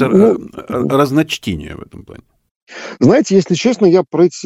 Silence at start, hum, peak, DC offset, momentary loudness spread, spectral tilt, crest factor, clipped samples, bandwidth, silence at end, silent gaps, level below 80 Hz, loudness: 0 s; none; 0 dBFS; under 0.1%; 20 LU; -6 dB/octave; 14 dB; under 0.1%; 14.5 kHz; 0 s; 2.51-2.67 s; -48 dBFS; -13 LUFS